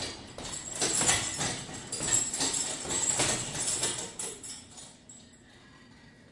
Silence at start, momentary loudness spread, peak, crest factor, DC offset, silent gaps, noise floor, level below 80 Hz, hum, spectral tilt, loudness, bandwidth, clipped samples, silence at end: 0 s; 16 LU; -10 dBFS; 24 dB; under 0.1%; none; -55 dBFS; -58 dBFS; none; -1 dB/octave; -29 LUFS; 11.5 kHz; under 0.1%; 0 s